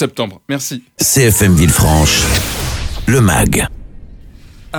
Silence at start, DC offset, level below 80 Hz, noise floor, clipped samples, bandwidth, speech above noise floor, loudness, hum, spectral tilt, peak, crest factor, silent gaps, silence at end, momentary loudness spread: 0 s; under 0.1%; -24 dBFS; -36 dBFS; under 0.1%; over 20 kHz; 24 dB; -12 LUFS; none; -4 dB/octave; 0 dBFS; 12 dB; none; 0 s; 11 LU